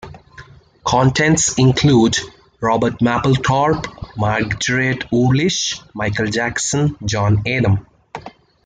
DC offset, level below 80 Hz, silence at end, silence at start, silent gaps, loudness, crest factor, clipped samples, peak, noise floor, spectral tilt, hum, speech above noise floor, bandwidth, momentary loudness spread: under 0.1%; -42 dBFS; 0.35 s; 0.05 s; none; -17 LUFS; 14 dB; under 0.1%; -2 dBFS; -42 dBFS; -4.5 dB/octave; none; 26 dB; 9.6 kHz; 9 LU